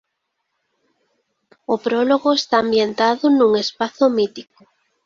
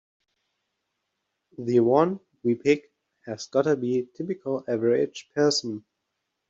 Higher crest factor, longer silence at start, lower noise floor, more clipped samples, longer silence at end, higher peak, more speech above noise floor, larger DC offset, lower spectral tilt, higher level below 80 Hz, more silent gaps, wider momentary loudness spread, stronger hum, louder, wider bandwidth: about the same, 18 dB vs 20 dB; about the same, 1.7 s vs 1.6 s; second, -75 dBFS vs -80 dBFS; neither; about the same, 0.65 s vs 0.7 s; first, -2 dBFS vs -6 dBFS; about the same, 58 dB vs 56 dB; neither; about the same, -4.5 dB/octave vs -5.5 dB/octave; first, -64 dBFS vs -72 dBFS; neither; second, 9 LU vs 13 LU; neither; first, -17 LUFS vs -25 LUFS; about the same, 7.4 kHz vs 8 kHz